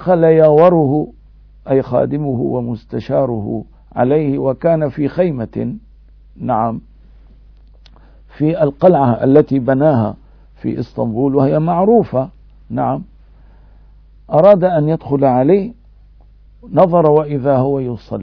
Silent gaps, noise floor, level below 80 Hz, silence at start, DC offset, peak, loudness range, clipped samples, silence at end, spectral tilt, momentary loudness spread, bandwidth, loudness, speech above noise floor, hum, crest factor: none; -43 dBFS; -42 dBFS; 0 s; under 0.1%; 0 dBFS; 5 LU; 0.1%; 0 s; -11.5 dB/octave; 14 LU; 5.4 kHz; -14 LUFS; 30 dB; none; 14 dB